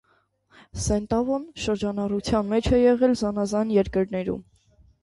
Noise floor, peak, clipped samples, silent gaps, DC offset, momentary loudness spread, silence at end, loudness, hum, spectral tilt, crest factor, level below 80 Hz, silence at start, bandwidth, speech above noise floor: -65 dBFS; -8 dBFS; under 0.1%; none; under 0.1%; 10 LU; 0.6 s; -24 LUFS; none; -6 dB/octave; 16 dB; -42 dBFS; 0.75 s; 11.5 kHz; 42 dB